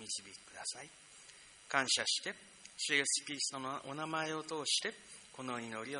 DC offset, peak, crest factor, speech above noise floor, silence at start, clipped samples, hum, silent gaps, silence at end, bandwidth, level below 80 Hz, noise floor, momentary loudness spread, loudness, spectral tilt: under 0.1%; -14 dBFS; 24 dB; 19 dB; 0 s; under 0.1%; none; none; 0 s; 10.5 kHz; -80 dBFS; -58 dBFS; 21 LU; -36 LUFS; -1 dB/octave